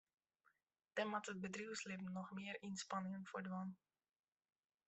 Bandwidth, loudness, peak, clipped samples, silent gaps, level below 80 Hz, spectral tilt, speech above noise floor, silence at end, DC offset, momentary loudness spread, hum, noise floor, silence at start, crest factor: 8.2 kHz; -48 LUFS; -30 dBFS; under 0.1%; none; -88 dBFS; -4.5 dB/octave; 34 dB; 1.1 s; under 0.1%; 5 LU; none; -82 dBFS; 0.95 s; 20 dB